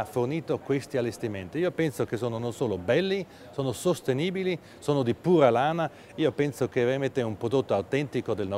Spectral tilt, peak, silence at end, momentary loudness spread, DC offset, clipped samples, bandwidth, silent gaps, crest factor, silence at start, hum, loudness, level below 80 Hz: -6.5 dB/octave; -6 dBFS; 0 s; 8 LU; under 0.1%; under 0.1%; 16 kHz; none; 20 dB; 0 s; none; -28 LUFS; -62 dBFS